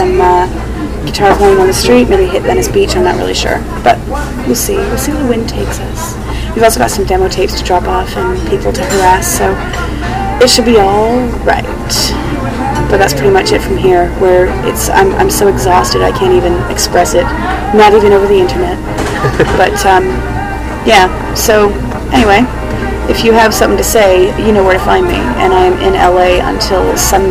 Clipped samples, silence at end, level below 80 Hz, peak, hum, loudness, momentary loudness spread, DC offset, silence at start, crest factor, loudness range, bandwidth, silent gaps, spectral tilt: 1%; 0 s; -20 dBFS; 0 dBFS; none; -10 LUFS; 9 LU; under 0.1%; 0 s; 10 dB; 4 LU; 16 kHz; none; -4.5 dB/octave